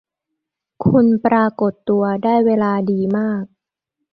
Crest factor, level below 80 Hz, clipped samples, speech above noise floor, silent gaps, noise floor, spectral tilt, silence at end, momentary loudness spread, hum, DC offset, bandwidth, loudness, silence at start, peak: 16 dB; -52 dBFS; under 0.1%; 64 dB; none; -79 dBFS; -11 dB/octave; 0.7 s; 7 LU; none; under 0.1%; 5 kHz; -17 LUFS; 0.8 s; -2 dBFS